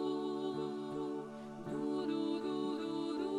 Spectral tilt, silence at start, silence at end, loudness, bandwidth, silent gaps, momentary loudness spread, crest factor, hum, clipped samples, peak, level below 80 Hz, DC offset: -6.5 dB/octave; 0 s; 0 s; -39 LUFS; 11 kHz; none; 6 LU; 12 dB; none; under 0.1%; -26 dBFS; -74 dBFS; under 0.1%